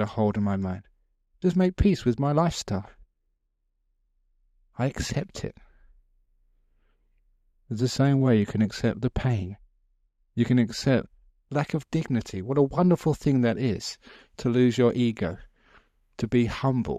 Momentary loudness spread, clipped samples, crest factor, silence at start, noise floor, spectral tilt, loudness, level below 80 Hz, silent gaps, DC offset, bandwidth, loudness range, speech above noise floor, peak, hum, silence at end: 12 LU; under 0.1%; 18 dB; 0 s; -75 dBFS; -7 dB/octave; -26 LUFS; -44 dBFS; none; under 0.1%; 13 kHz; 11 LU; 50 dB; -8 dBFS; none; 0 s